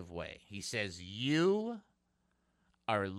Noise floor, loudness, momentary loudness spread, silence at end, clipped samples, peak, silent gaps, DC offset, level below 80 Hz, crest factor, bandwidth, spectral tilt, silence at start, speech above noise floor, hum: -78 dBFS; -36 LUFS; 14 LU; 0 s; under 0.1%; -18 dBFS; none; under 0.1%; -68 dBFS; 20 dB; 13 kHz; -5 dB/octave; 0 s; 43 dB; none